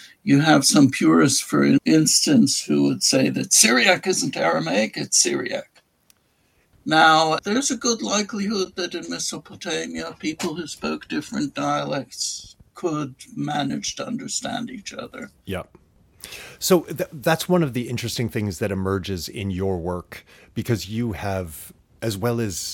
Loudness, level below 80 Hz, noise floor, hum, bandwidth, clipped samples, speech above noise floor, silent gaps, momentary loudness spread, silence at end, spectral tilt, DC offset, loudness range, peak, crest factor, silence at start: -21 LUFS; -56 dBFS; -64 dBFS; none; 17.5 kHz; under 0.1%; 42 dB; none; 17 LU; 0 s; -3.5 dB/octave; under 0.1%; 11 LU; 0 dBFS; 22 dB; 0 s